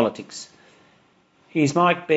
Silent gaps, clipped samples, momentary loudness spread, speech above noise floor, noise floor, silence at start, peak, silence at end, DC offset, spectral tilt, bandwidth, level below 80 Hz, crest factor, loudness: none; under 0.1%; 19 LU; 38 dB; -59 dBFS; 0 s; -4 dBFS; 0 s; under 0.1%; -5.5 dB/octave; 8 kHz; -68 dBFS; 20 dB; -21 LUFS